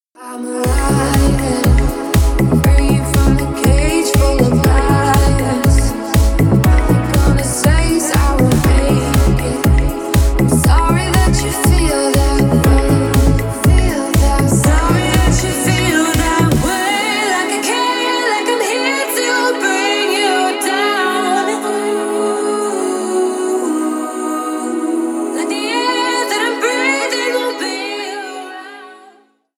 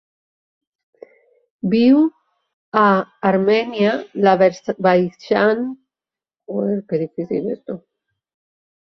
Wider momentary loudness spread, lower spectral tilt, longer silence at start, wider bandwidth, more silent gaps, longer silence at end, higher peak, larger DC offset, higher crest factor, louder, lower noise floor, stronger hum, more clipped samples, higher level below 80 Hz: second, 6 LU vs 13 LU; second, -5 dB/octave vs -7.5 dB/octave; second, 0.2 s vs 1.65 s; first, over 20 kHz vs 6.4 kHz; second, none vs 2.53-2.72 s; second, 0.65 s vs 1.05 s; about the same, 0 dBFS vs 0 dBFS; neither; about the same, 14 dB vs 18 dB; first, -14 LUFS vs -18 LUFS; second, -48 dBFS vs under -90 dBFS; neither; neither; first, -18 dBFS vs -62 dBFS